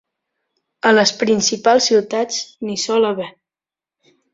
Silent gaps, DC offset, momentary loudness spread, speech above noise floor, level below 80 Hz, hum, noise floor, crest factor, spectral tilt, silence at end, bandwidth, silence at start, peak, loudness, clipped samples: none; under 0.1%; 11 LU; over 74 dB; -62 dBFS; none; under -90 dBFS; 16 dB; -2.5 dB/octave; 1.05 s; 7.8 kHz; 0.85 s; -2 dBFS; -16 LUFS; under 0.1%